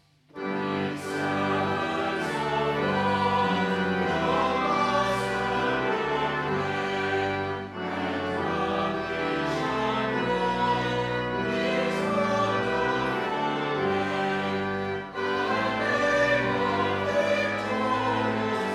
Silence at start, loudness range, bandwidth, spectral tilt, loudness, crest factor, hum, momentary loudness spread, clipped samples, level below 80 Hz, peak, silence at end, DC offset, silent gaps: 0.35 s; 3 LU; 13.5 kHz; -5.5 dB/octave; -26 LUFS; 14 dB; none; 5 LU; under 0.1%; -54 dBFS; -12 dBFS; 0 s; under 0.1%; none